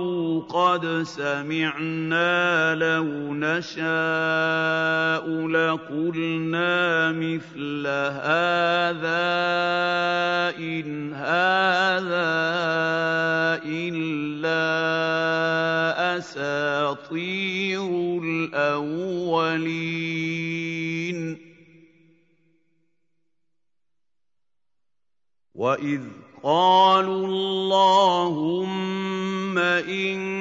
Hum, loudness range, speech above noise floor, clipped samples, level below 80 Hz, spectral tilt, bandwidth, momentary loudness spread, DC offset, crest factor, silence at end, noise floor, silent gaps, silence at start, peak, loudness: none; 9 LU; 66 dB; under 0.1%; -72 dBFS; -5.5 dB/octave; 7.8 kHz; 8 LU; under 0.1%; 18 dB; 0 s; -89 dBFS; none; 0 s; -6 dBFS; -23 LUFS